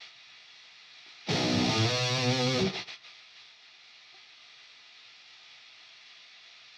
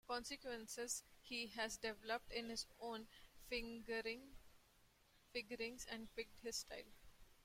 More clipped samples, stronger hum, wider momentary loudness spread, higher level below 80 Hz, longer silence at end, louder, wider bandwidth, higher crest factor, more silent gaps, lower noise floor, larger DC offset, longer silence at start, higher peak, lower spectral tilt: neither; neither; first, 25 LU vs 8 LU; about the same, -66 dBFS vs -68 dBFS; first, 0.3 s vs 0 s; first, -28 LUFS vs -48 LUFS; second, 12.5 kHz vs 16.5 kHz; about the same, 18 dB vs 20 dB; neither; second, -55 dBFS vs -74 dBFS; neither; about the same, 0 s vs 0.05 s; first, -16 dBFS vs -30 dBFS; first, -4.5 dB/octave vs -1.5 dB/octave